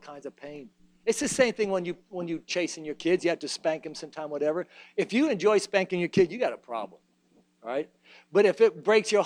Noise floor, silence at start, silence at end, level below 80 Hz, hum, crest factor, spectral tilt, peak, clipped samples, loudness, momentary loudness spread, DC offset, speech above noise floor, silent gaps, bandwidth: -65 dBFS; 0.05 s; 0 s; -66 dBFS; none; 20 dB; -4 dB/octave; -8 dBFS; under 0.1%; -27 LUFS; 18 LU; under 0.1%; 38 dB; none; 13 kHz